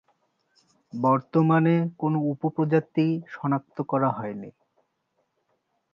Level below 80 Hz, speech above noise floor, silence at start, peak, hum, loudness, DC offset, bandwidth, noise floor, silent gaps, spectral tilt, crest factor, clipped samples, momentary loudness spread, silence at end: -74 dBFS; 50 dB; 0.95 s; -8 dBFS; none; -25 LUFS; under 0.1%; 5.8 kHz; -75 dBFS; none; -10 dB/octave; 18 dB; under 0.1%; 12 LU; 1.45 s